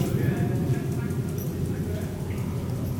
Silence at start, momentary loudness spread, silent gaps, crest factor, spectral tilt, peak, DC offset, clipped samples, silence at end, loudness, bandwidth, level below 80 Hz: 0 s; 5 LU; none; 14 dB; -7.5 dB/octave; -12 dBFS; under 0.1%; under 0.1%; 0 s; -28 LUFS; 19 kHz; -44 dBFS